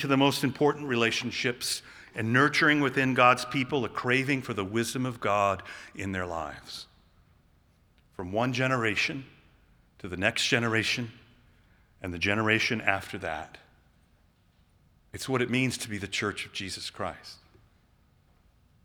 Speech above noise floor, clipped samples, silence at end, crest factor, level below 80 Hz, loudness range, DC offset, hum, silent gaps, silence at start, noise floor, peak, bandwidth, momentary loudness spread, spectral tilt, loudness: 36 dB; under 0.1%; 1.5 s; 24 dB; -62 dBFS; 8 LU; under 0.1%; none; none; 0 s; -64 dBFS; -6 dBFS; over 20 kHz; 17 LU; -4.5 dB/octave; -27 LUFS